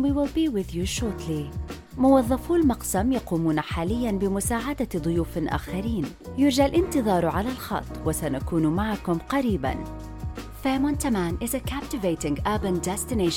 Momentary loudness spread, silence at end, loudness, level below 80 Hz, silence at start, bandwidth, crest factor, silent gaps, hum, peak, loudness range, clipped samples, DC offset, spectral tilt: 9 LU; 0 s; -25 LUFS; -38 dBFS; 0 s; 18.5 kHz; 16 dB; none; none; -8 dBFS; 3 LU; under 0.1%; under 0.1%; -5.5 dB/octave